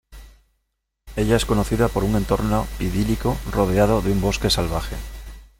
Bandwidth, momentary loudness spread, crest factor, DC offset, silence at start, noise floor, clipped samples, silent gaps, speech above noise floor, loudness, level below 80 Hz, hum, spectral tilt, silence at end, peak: 17 kHz; 12 LU; 18 dB; under 0.1%; 0.1 s; -75 dBFS; under 0.1%; none; 55 dB; -21 LUFS; -30 dBFS; none; -5.5 dB/octave; 0.15 s; -4 dBFS